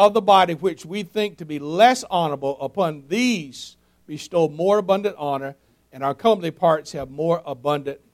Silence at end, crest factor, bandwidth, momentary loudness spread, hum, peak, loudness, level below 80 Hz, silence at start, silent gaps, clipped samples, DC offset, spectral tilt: 0.15 s; 20 dB; 15.5 kHz; 15 LU; none; -2 dBFS; -21 LUFS; -60 dBFS; 0 s; none; under 0.1%; under 0.1%; -5 dB/octave